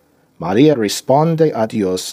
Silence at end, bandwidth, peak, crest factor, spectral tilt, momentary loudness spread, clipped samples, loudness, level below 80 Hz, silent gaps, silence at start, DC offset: 0 s; 16 kHz; 0 dBFS; 14 dB; -6 dB/octave; 6 LU; under 0.1%; -15 LUFS; -58 dBFS; none; 0.4 s; under 0.1%